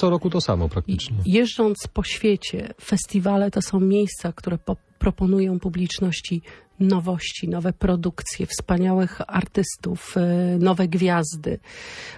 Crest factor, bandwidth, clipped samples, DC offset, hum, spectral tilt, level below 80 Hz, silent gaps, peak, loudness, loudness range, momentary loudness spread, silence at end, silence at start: 16 dB; 11 kHz; under 0.1%; under 0.1%; none; -6 dB/octave; -38 dBFS; none; -6 dBFS; -23 LUFS; 2 LU; 9 LU; 0 s; 0 s